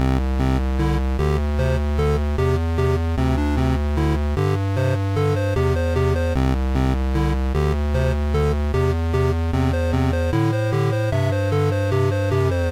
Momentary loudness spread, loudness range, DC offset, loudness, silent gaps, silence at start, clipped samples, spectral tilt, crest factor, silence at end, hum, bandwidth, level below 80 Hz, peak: 1 LU; 1 LU; under 0.1%; -21 LUFS; none; 0 s; under 0.1%; -7.5 dB/octave; 8 dB; 0 s; none; 14 kHz; -24 dBFS; -12 dBFS